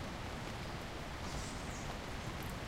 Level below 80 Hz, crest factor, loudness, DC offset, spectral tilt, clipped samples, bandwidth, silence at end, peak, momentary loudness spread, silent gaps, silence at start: -50 dBFS; 14 dB; -44 LUFS; under 0.1%; -4.5 dB/octave; under 0.1%; 16 kHz; 0 s; -30 dBFS; 2 LU; none; 0 s